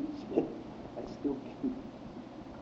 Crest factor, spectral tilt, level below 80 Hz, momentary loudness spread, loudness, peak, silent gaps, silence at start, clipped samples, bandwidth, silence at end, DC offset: 24 dB; -7 dB/octave; -60 dBFS; 12 LU; -39 LUFS; -14 dBFS; none; 0 s; under 0.1%; 7.6 kHz; 0 s; under 0.1%